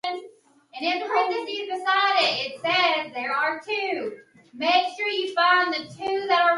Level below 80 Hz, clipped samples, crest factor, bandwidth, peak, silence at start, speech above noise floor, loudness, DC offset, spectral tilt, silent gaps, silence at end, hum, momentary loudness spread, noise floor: -76 dBFS; under 0.1%; 18 dB; 11.5 kHz; -6 dBFS; 0.05 s; 27 dB; -23 LUFS; under 0.1%; -3 dB/octave; none; 0 s; none; 10 LU; -51 dBFS